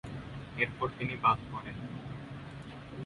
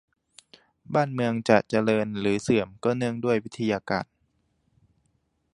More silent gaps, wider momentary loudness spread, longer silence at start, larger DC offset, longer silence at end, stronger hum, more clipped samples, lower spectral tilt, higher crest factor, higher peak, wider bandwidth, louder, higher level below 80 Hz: neither; first, 16 LU vs 7 LU; second, 0.05 s vs 0.9 s; neither; second, 0 s vs 1.5 s; neither; neither; about the same, -7 dB/octave vs -6.5 dB/octave; about the same, 22 dB vs 24 dB; second, -14 dBFS vs -2 dBFS; about the same, 11.5 kHz vs 11.5 kHz; second, -34 LUFS vs -25 LUFS; about the same, -56 dBFS vs -60 dBFS